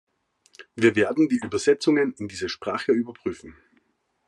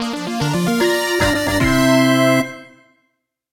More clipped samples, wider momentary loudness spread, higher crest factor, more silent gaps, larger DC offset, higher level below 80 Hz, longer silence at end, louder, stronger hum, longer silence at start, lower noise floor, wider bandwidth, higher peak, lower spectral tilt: neither; first, 13 LU vs 8 LU; about the same, 20 dB vs 16 dB; neither; neither; second, -66 dBFS vs -36 dBFS; second, 0.75 s vs 0.9 s; second, -24 LUFS vs -16 LUFS; neither; first, 0.6 s vs 0 s; about the same, -69 dBFS vs -70 dBFS; second, 11 kHz vs 16 kHz; second, -6 dBFS vs -2 dBFS; about the same, -5 dB/octave vs -4.5 dB/octave